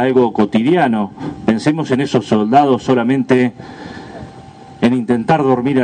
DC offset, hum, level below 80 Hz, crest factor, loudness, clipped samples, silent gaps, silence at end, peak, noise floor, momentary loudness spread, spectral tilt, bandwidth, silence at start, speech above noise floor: under 0.1%; none; -52 dBFS; 14 dB; -14 LUFS; under 0.1%; none; 0 s; 0 dBFS; -36 dBFS; 19 LU; -7 dB/octave; 9.4 kHz; 0 s; 23 dB